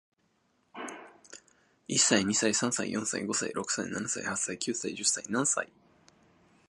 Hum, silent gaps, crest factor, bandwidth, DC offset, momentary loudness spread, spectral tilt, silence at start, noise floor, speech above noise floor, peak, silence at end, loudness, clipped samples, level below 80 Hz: none; none; 24 dB; 11.5 kHz; under 0.1%; 18 LU; -2 dB/octave; 0.75 s; -73 dBFS; 42 dB; -8 dBFS; 1 s; -29 LUFS; under 0.1%; -70 dBFS